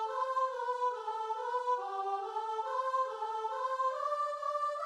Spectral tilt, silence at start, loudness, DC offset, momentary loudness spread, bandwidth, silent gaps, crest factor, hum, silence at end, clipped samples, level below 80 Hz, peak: -1 dB/octave; 0 s; -35 LUFS; under 0.1%; 4 LU; 11.5 kHz; none; 12 dB; none; 0 s; under 0.1%; -84 dBFS; -22 dBFS